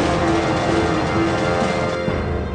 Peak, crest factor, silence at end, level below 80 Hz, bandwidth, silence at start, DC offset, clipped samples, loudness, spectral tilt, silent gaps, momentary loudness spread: -8 dBFS; 12 dB; 0 s; -32 dBFS; 10 kHz; 0 s; under 0.1%; under 0.1%; -19 LUFS; -6 dB/octave; none; 4 LU